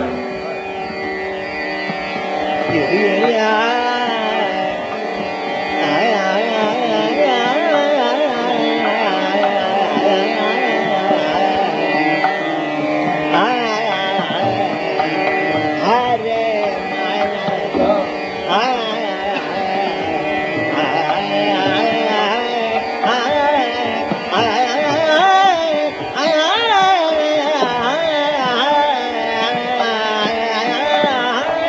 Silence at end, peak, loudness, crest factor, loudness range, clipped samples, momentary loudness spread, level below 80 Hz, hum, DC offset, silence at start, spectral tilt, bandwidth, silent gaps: 0 s; -2 dBFS; -16 LUFS; 16 dB; 3 LU; under 0.1%; 6 LU; -56 dBFS; none; under 0.1%; 0 s; -1.5 dB/octave; 8 kHz; none